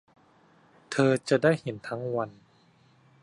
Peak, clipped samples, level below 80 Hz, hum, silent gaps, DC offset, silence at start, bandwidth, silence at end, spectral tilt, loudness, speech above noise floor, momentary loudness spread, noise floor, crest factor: -8 dBFS; under 0.1%; -70 dBFS; none; none; under 0.1%; 0.9 s; 11.5 kHz; 0.9 s; -6 dB/octave; -27 LUFS; 35 dB; 11 LU; -62 dBFS; 22 dB